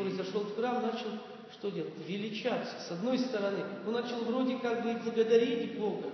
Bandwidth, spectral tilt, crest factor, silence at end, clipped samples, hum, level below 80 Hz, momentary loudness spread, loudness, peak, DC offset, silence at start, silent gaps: 6.4 kHz; -6 dB/octave; 20 dB; 0 s; under 0.1%; none; -86 dBFS; 12 LU; -33 LUFS; -14 dBFS; under 0.1%; 0 s; none